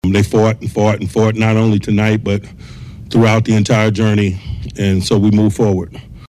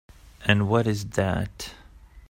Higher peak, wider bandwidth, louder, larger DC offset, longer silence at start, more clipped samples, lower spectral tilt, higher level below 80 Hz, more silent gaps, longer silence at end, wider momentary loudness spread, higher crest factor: about the same, -4 dBFS vs -2 dBFS; second, 13 kHz vs 16 kHz; first, -14 LUFS vs -25 LUFS; neither; second, 0.05 s vs 0.4 s; neither; about the same, -6.5 dB/octave vs -6 dB/octave; first, -36 dBFS vs -46 dBFS; neither; about the same, 0 s vs 0.1 s; about the same, 13 LU vs 15 LU; second, 10 dB vs 24 dB